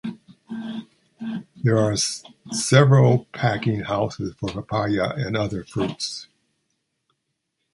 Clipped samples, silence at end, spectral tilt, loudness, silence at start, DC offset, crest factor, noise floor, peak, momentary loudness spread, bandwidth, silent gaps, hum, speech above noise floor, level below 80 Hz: under 0.1%; 1.5 s; -5.5 dB/octave; -22 LUFS; 0.05 s; under 0.1%; 22 dB; -77 dBFS; -2 dBFS; 18 LU; 11.5 kHz; none; none; 56 dB; -52 dBFS